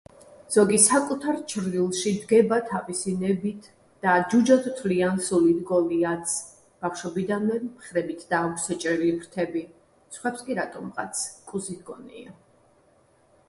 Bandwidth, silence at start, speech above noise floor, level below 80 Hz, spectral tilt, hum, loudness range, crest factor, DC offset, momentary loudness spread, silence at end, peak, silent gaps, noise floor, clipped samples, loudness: 12 kHz; 0.3 s; 37 dB; -64 dBFS; -4.5 dB/octave; none; 10 LU; 20 dB; under 0.1%; 13 LU; 1.15 s; -6 dBFS; none; -61 dBFS; under 0.1%; -25 LUFS